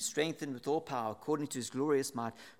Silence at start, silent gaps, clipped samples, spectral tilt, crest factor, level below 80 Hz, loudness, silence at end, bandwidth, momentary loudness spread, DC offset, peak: 0 s; none; under 0.1%; -4 dB/octave; 18 dB; -82 dBFS; -36 LUFS; 0.1 s; 16.5 kHz; 6 LU; under 0.1%; -18 dBFS